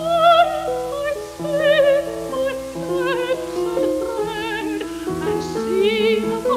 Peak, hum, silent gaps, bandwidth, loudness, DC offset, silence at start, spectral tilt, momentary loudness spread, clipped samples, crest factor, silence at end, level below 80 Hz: -4 dBFS; none; none; 16 kHz; -20 LUFS; under 0.1%; 0 s; -4.5 dB/octave; 11 LU; under 0.1%; 16 dB; 0 s; -48 dBFS